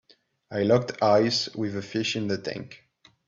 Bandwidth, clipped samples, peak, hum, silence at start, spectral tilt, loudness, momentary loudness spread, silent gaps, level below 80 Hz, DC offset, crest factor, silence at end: 7.8 kHz; under 0.1%; -8 dBFS; none; 0.5 s; -5 dB/octave; -25 LUFS; 14 LU; none; -66 dBFS; under 0.1%; 18 dB; 0.5 s